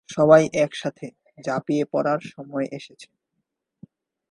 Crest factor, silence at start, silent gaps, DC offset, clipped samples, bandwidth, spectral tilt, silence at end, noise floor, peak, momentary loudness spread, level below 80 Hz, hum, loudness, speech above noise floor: 22 dB; 0.1 s; none; under 0.1%; under 0.1%; 10.5 kHz; -6 dB/octave; 1.25 s; -79 dBFS; -2 dBFS; 23 LU; -62 dBFS; none; -22 LUFS; 57 dB